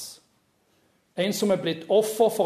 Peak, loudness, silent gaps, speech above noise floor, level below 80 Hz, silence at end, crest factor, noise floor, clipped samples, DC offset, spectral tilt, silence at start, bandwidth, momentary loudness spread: -8 dBFS; -24 LUFS; none; 44 dB; -72 dBFS; 0 s; 18 dB; -67 dBFS; under 0.1%; under 0.1%; -4.5 dB/octave; 0 s; 14 kHz; 14 LU